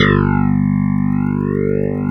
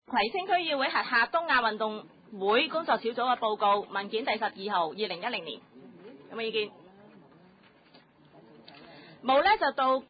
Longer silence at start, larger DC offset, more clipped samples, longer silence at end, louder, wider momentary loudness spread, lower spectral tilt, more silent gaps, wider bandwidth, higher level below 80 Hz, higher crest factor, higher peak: about the same, 0 s vs 0.1 s; neither; neither; about the same, 0 s vs 0.05 s; first, -16 LUFS vs -28 LUFS; second, 4 LU vs 11 LU; first, -9 dB/octave vs -7 dB/octave; neither; about the same, 5.2 kHz vs 5 kHz; first, -32 dBFS vs -68 dBFS; about the same, 14 dB vs 18 dB; first, 0 dBFS vs -12 dBFS